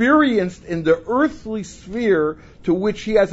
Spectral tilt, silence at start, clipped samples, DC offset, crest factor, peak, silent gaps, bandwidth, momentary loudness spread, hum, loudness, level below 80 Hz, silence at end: -6.5 dB/octave; 0 s; under 0.1%; under 0.1%; 16 dB; -2 dBFS; none; 8 kHz; 12 LU; none; -20 LUFS; -46 dBFS; 0 s